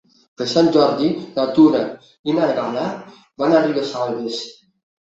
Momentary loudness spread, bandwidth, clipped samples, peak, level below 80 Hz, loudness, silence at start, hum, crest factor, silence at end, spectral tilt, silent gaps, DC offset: 14 LU; 7.8 kHz; under 0.1%; -2 dBFS; -62 dBFS; -18 LUFS; 0.4 s; none; 16 dB; 0.55 s; -6 dB/octave; 2.19-2.24 s; under 0.1%